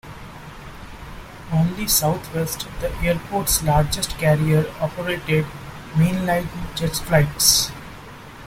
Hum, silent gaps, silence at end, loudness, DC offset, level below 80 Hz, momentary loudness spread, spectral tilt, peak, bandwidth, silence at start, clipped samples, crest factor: none; none; 0 s; -20 LUFS; under 0.1%; -36 dBFS; 21 LU; -4 dB/octave; 0 dBFS; 16.5 kHz; 0.05 s; under 0.1%; 22 dB